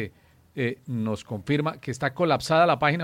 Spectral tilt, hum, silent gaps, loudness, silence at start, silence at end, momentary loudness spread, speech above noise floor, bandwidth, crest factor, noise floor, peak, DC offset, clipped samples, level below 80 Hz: -6 dB/octave; none; none; -25 LUFS; 0 s; 0 s; 11 LU; 27 dB; 16 kHz; 18 dB; -52 dBFS; -8 dBFS; under 0.1%; under 0.1%; -60 dBFS